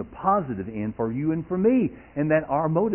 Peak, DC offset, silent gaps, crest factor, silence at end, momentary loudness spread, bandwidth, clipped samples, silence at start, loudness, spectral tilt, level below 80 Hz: -8 dBFS; under 0.1%; none; 16 dB; 0 s; 8 LU; 3.2 kHz; under 0.1%; 0 s; -25 LUFS; -12.5 dB/octave; -52 dBFS